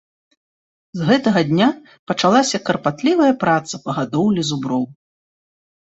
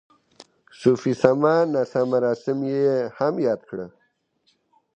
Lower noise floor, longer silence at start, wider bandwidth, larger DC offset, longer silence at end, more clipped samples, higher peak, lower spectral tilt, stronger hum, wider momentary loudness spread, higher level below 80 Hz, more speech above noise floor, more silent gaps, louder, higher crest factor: first, under -90 dBFS vs -68 dBFS; first, 0.95 s vs 0.8 s; about the same, 8.2 kHz vs 8.8 kHz; neither; second, 0.95 s vs 1.1 s; neither; about the same, -2 dBFS vs 0 dBFS; second, -5 dB/octave vs -7.5 dB/octave; neither; about the same, 9 LU vs 9 LU; first, -58 dBFS vs -66 dBFS; first, over 73 dB vs 47 dB; first, 1.99-2.07 s vs none; first, -18 LUFS vs -22 LUFS; about the same, 18 dB vs 22 dB